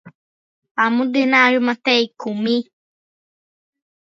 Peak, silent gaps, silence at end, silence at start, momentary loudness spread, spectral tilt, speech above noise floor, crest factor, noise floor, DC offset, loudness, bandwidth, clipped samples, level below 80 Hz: 0 dBFS; 0.15-0.62 s, 0.71-0.75 s; 1.5 s; 0.05 s; 10 LU; -4.5 dB/octave; over 73 dB; 20 dB; under -90 dBFS; under 0.1%; -17 LUFS; 7.4 kHz; under 0.1%; -74 dBFS